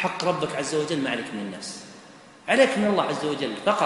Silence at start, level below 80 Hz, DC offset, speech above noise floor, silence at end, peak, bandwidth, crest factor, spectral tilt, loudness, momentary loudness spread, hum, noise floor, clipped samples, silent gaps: 0 s; -66 dBFS; under 0.1%; 23 dB; 0 s; -4 dBFS; 11.5 kHz; 20 dB; -4 dB/octave; -25 LUFS; 16 LU; none; -48 dBFS; under 0.1%; none